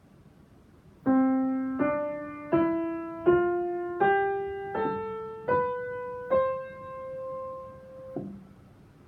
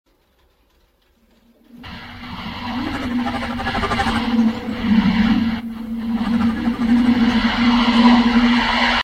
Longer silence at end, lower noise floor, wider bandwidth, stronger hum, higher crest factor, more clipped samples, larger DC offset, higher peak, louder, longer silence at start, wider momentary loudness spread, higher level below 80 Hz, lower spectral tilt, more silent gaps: first, 0.4 s vs 0 s; about the same, -56 dBFS vs -59 dBFS; second, 4.4 kHz vs 9.2 kHz; neither; about the same, 20 dB vs 18 dB; neither; neither; second, -10 dBFS vs -2 dBFS; second, -29 LUFS vs -17 LUFS; second, 0.85 s vs 1.75 s; about the same, 16 LU vs 15 LU; second, -60 dBFS vs -36 dBFS; first, -9 dB/octave vs -5.5 dB/octave; neither